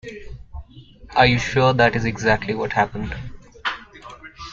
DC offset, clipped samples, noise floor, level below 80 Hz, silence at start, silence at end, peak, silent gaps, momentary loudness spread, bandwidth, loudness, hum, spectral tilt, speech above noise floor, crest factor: under 0.1%; under 0.1%; -44 dBFS; -40 dBFS; 0.05 s; 0 s; -2 dBFS; none; 23 LU; 7.6 kHz; -20 LUFS; none; -5.5 dB/octave; 25 dB; 20 dB